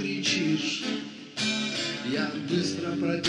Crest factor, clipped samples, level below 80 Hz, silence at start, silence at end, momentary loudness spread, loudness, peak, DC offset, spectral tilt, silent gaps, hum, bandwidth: 16 dB; under 0.1%; -72 dBFS; 0 s; 0 s; 5 LU; -28 LUFS; -12 dBFS; under 0.1%; -3.5 dB/octave; none; none; 11.5 kHz